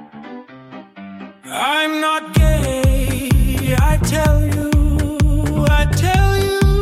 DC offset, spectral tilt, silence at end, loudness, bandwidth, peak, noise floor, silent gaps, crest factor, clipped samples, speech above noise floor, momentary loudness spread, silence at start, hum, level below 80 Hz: under 0.1%; -5.5 dB/octave; 0 s; -16 LUFS; 15.5 kHz; -4 dBFS; -37 dBFS; none; 12 dB; under 0.1%; 21 dB; 20 LU; 0 s; none; -20 dBFS